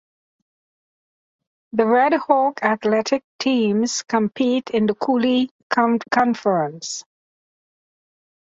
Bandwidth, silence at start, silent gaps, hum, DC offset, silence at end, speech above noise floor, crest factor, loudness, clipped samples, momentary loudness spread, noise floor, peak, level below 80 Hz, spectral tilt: 8 kHz; 1.75 s; 3.24-3.39 s, 5.51-5.70 s; none; under 0.1%; 1.55 s; over 71 dB; 18 dB; -20 LUFS; under 0.1%; 6 LU; under -90 dBFS; -2 dBFS; -66 dBFS; -4.5 dB/octave